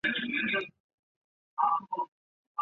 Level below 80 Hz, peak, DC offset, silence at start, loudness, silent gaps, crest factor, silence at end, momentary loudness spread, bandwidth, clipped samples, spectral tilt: -74 dBFS; -16 dBFS; under 0.1%; 0.05 s; -31 LUFS; 0.80-1.57 s, 2.08-2.55 s; 18 dB; 0 s; 13 LU; 7 kHz; under 0.1%; -0.5 dB/octave